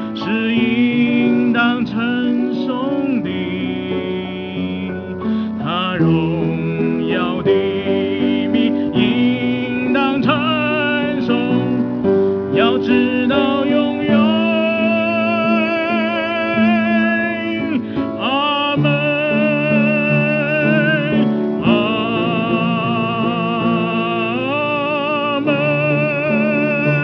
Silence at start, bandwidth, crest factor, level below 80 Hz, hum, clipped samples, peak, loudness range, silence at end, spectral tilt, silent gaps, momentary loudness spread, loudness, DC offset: 0 s; 5.4 kHz; 16 dB; -52 dBFS; none; under 0.1%; -2 dBFS; 4 LU; 0 s; -8.5 dB/octave; none; 6 LU; -17 LUFS; under 0.1%